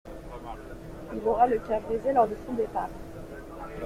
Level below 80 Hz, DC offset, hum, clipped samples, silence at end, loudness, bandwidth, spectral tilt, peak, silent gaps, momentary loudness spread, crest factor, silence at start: -48 dBFS; under 0.1%; none; under 0.1%; 0 s; -27 LUFS; 15.5 kHz; -7 dB/octave; -10 dBFS; none; 18 LU; 20 dB; 0.05 s